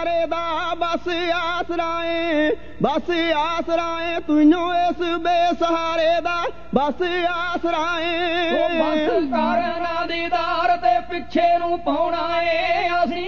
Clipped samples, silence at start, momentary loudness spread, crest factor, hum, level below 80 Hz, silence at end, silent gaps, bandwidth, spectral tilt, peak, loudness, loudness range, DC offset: under 0.1%; 0 s; 5 LU; 18 dB; 60 Hz at -45 dBFS; -48 dBFS; 0 s; none; 7 kHz; -5 dB/octave; -2 dBFS; -21 LUFS; 2 LU; 2%